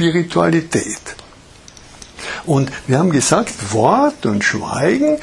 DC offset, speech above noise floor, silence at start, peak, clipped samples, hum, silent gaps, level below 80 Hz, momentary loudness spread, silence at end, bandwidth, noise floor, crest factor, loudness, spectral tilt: under 0.1%; 26 dB; 0 s; 0 dBFS; under 0.1%; none; none; -48 dBFS; 14 LU; 0 s; 12 kHz; -42 dBFS; 16 dB; -16 LUFS; -5 dB/octave